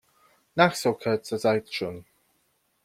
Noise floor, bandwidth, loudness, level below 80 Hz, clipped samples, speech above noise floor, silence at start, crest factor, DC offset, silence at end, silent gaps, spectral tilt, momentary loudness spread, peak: -71 dBFS; 16 kHz; -26 LUFS; -66 dBFS; under 0.1%; 46 dB; 0.55 s; 22 dB; under 0.1%; 0.85 s; none; -5 dB/octave; 12 LU; -4 dBFS